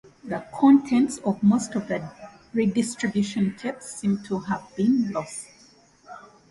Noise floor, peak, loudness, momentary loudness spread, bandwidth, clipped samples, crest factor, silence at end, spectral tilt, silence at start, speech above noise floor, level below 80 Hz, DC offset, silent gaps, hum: -55 dBFS; -6 dBFS; -24 LUFS; 16 LU; 11.5 kHz; under 0.1%; 18 dB; 0.3 s; -6 dB/octave; 0.25 s; 32 dB; -62 dBFS; under 0.1%; none; none